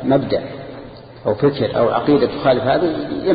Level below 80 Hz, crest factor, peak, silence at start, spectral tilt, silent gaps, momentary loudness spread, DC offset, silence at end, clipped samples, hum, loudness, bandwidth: -46 dBFS; 14 dB; -2 dBFS; 0 s; -12 dB/octave; none; 17 LU; under 0.1%; 0 s; under 0.1%; none; -17 LUFS; 5 kHz